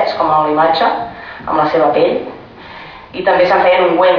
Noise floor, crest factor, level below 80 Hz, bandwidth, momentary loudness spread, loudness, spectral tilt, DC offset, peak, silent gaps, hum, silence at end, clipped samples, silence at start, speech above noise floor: -33 dBFS; 12 dB; -48 dBFS; 5.4 kHz; 21 LU; -13 LUFS; -6.5 dB/octave; under 0.1%; 0 dBFS; none; none; 0 s; under 0.1%; 0 s; 21 dB